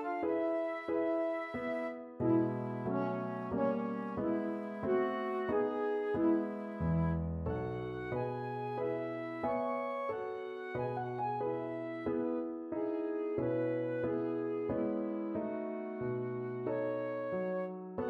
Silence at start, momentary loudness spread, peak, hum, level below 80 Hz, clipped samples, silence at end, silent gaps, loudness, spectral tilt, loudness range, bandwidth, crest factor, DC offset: 0 s; 6 LU; -20 dBFS; none; -58 dBFS; under 0.1%; 0 s; none; -36 LUFS; -10 dB/octave; 3 LU; 5.6 kHz; 16 dB; under 0.1%